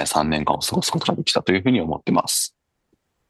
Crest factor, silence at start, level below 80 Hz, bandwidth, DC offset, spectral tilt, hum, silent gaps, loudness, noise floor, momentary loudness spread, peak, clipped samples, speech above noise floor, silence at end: 20 dB; 0 s; -48 dBFS; 13 kHz; under 0.1%; -3.5 dB/octave; none; none; -21 LUFS; -69 dBFS; 3 LU; -2 dBFS; under 0.1%; 49 dB; 0.8 s